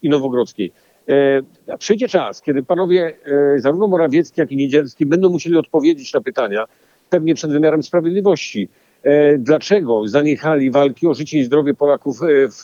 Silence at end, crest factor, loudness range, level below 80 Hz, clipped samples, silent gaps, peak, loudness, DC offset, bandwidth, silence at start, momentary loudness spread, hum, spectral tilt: 0 s; 14 dB; 2 LU; -70 dBFS; under 0.1%; none; -2 dBFS; -16 LUFS; under 0.1%; 7.4 kHz; 0.05 s; 7 LU; none; -6.5 dB/octave